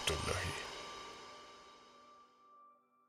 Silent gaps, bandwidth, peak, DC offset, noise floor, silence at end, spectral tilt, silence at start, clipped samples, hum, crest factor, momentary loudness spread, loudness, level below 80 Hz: none; 16 kHz; -20 dBFS; under 0.1%; -66 dBFS; 0.35 s; -3 dB/octave; 0 s; under 0.1%; none; 24 dB; 25 LU; -42 LUFS; -58 dBFS